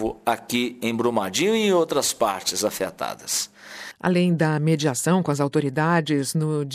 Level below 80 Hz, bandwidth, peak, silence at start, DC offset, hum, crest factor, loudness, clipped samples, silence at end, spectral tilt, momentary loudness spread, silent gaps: -58 dBFS; 15.5 kHz; -8 dBFS; 0 s; under 0.1%; none; 16 dB; -22 LUFS; under 0.1%; 0 s; -4.5 dB/octave; 7 LU; none